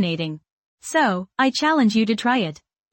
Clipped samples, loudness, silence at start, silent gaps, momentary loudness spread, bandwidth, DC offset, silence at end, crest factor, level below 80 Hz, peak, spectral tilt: under 0.1%; -21 LUFS; 0 s; 0.52-0.78 s; 12 LU; 17 kHz; under 0.1%; 0.4 s; 14 dB; -66 dBFS; -6 dBFS; -4.5 dB/octave